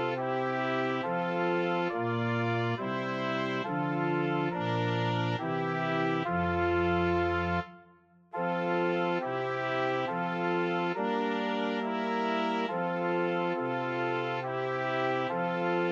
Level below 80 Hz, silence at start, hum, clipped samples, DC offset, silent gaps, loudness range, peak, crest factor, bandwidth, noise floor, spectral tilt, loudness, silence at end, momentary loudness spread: -60 dBFS; 0 s; none; under 0.1%; under 0.1%; none; 1 LU; -16 dBFS; 14 dB; 7.4 kHz; -60 dBFS; -7.5 dB/octave; -30 LUFS; 0 s; 3 LU